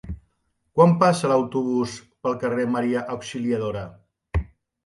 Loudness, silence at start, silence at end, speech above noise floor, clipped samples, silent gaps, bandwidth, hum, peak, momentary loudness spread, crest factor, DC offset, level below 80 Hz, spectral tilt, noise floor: -23 LUFS; 0.05 s; 0.4 s; 50 dB; under 0.1%; none; 11.5 kHz; none; -4 dBFS; 16 LU; 20 dB; under 0.1%; -40 dBFS; -6.5 dB/octave; -71 dBFS